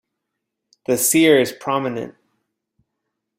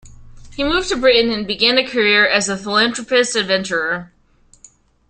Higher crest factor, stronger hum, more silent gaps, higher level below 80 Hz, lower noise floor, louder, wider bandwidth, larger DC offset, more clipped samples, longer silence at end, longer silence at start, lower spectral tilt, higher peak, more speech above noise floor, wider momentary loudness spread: about the same, 20 dB vs 18 dB; neither; neither; second, -66 dBFS vs -42 dBFS; first, -79 dBFS vs -53 dBFS; about the same, -17 LUFS vs -16 LUFS; first, 16 kHz vs 9.4 kHz; neither; neither; first, 1.3 s vs 1.05 s; first, 0.9 s vs 0.05 s; about the same, -3.5 dB/octave vs -2.5 dB/octave; about the same, -2 dBFS vs 0 dBFS; first, 62 dB vs 36 dB; first, 18 LU vs 8 LU